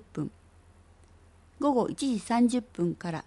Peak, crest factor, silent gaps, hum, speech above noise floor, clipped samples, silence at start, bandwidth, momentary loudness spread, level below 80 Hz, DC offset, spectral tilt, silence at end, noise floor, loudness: -14 dBFS; 16 dB; none; none; 29 dB; under 0.1%; 0.15 s; 11.5 kHz; 12 LU; -60 dBFS; under 0.1%; -6 dB/octave; 0.05 s; -57 dBFS; -29 LUFS